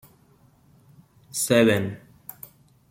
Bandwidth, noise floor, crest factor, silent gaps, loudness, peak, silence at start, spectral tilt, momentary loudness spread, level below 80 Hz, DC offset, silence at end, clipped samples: 16.5 kHz; -58 dBFS; 22 dB; none; -22 LUFS; -4 dBFS; 1.35 s; -4.5 dB/octave; 25 LU; -64 dBFS; under 0.1%; 0.95 s; under 0.1%